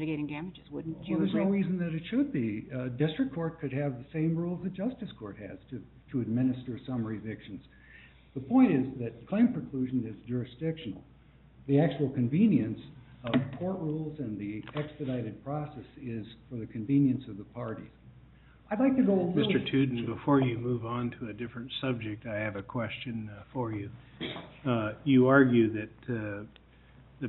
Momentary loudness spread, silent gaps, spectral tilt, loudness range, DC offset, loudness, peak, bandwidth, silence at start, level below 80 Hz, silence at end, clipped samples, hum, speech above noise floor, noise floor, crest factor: 17 LU; none; -6.5 dB/octave; 7 LU; under 0.1%; -31 LUFS; -8 dBFS; 4.2 kHz; 0 s; -60 dBFS; 0 s; under 0.1%; none; 26 dB; -57 dBFS; 22 dB